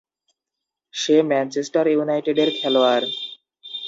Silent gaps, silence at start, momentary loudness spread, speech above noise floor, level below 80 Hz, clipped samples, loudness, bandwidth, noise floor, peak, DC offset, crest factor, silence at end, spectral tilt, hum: none; 0.95 s; 16 LU; 65 dB; -76 dBFS; under 0.1%; -20 LUFS; 7.8 kHz; -84 dBFS; -6 dBFS; under 0.1%; 16 dB; 0 s; -4 dB/octave; none